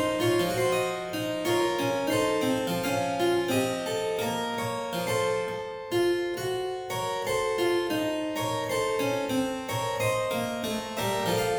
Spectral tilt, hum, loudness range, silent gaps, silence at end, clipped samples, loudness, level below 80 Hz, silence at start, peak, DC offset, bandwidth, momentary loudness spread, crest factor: -4.5 dB/octave; none; 2 LU; none; 0 s; under 0.1%; -28 LUFS; -58 dBFS; 0 s; -14 dBFS; under 0.1%; over 20 kHz; 5 LU; 14 dB